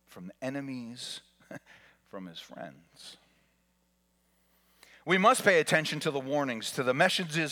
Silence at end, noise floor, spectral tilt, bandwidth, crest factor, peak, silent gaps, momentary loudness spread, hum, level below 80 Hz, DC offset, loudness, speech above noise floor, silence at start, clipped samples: 0 s; -73 dBFS; -4 dB/octave; 19 kHz; 22 dB; -10 dBFS; none; 25 LU; none; -78 dBFS; under 0.1%; -28 LUFS; 42 dB; 0.1 s; under 0.1%